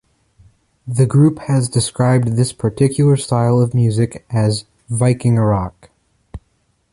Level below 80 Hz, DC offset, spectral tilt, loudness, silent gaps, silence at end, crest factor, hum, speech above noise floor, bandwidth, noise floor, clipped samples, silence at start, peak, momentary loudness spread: -42 dBFS; under 0.1%; -6.5 dB/octave; -16 LUFS; none; 0.55 s; 14 dB; none; 48 dB; 11.5 kHz; -62 dBFS; under 0.1%; 0.85 s; -2 dBFS; 7 LU